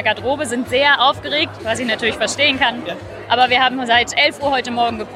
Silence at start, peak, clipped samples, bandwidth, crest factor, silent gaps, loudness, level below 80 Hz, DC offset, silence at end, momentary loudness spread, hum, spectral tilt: 0 s; -2 dBFS; under 0.1%; 14 kHz; 16 dB; none; -16 LUFS; -48 dBFS; under 0.1%; 0 s; 8 LU; none; -2.5 dB/octave